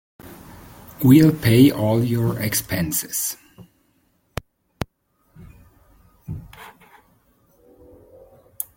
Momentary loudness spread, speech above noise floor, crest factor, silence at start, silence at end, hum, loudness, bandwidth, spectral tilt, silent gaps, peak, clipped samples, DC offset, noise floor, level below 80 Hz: 28 LU; 48 dB; 20 dB; 0.25 s; 0.15 s; none; -18 LUFS; 17 kHz; -5.5 dB/octave; none; -2 dBFS; under 0.1%; under 0.1%; -65 dBFS; -48 dBFS